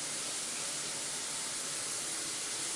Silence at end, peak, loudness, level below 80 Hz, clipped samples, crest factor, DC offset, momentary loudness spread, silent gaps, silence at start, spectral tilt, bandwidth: 0 s; -24 dBFS; -35 LUFS; -76 dBFS; under 0.1%; 14 dB; under 0.1%; 1 LU; none; 0 s; 0.5 dB/octave; 11.5 kHz